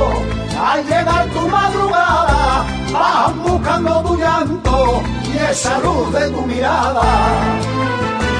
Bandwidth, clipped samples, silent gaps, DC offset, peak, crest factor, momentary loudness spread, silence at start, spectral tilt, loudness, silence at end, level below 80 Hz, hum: 10.5 kHz; under 0.1%; none; under 0.1%; -2 dBFS; 14 dB; 5 LU; 0 s; -5 dB/octave; -15 LUFS; 0 s; -26 dBFS; none